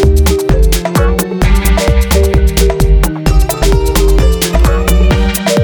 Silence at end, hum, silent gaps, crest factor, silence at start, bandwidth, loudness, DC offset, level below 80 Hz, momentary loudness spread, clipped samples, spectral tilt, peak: 0 s; none; none; 8 dB; 0 s; over 20 kHz; -11 LUFS; under 0.1%; -10 dBFS; 2 LU; under 0.1%; -5.5 dB/octave; 0 dBFS